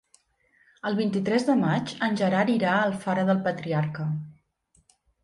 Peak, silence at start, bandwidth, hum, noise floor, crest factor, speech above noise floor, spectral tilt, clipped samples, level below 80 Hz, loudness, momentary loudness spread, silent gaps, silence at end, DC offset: -10 dBFS; 0.85 s; 11.5 kHz; none; -67 dBFS; 16 dB; 42 dB; -7 dB/octave; under 0.1%; -66 dBFS; -25 LUFS; 8 LU; none; 0.9 s; under 0.1%